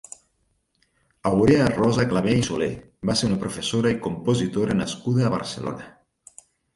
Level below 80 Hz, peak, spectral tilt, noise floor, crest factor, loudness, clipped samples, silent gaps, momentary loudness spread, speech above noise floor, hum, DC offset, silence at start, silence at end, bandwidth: -48 dBFS; -4 dBFS; -6 dB/octave; -70 dBFS; 18 dB; -23 LUFS; under 0.1%; none; 12 LU; 48 dB; none; under 0.1%; 1.25 s; 0.85 s; 11.5 kHz